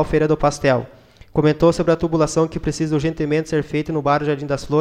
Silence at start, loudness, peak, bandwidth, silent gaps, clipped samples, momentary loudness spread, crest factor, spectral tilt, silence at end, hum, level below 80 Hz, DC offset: 0 s; -19 LUFS; -4 dBFS; 10.5 kHz; none; under 0.1%; 7 LU; 16 dB; -6.5 dB/octave; 0 s; none; -38 dBFS; under 0.1%